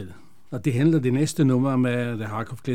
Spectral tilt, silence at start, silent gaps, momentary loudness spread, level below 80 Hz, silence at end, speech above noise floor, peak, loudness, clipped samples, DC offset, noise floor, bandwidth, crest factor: -7 dB/octave; 0 s; none; 10 LU; -62 dBFS; 0 s; 21 dB; -8 dBFS; -23 LUFS; under 0.1%; 0.7%; -43 dBFS; 15.5 kHz; 14 dB